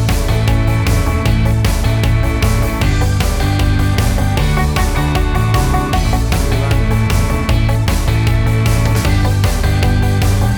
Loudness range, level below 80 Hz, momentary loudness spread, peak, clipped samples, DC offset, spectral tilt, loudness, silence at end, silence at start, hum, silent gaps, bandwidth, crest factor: 1 LU; -16 dBFS; 1 LU; -4 dBFS; under 0.1%; under 0.1%; -5.5 dB/octave; -14 LUFS; 0 s; 0 s; none; none; over 20 kHz; 10 dB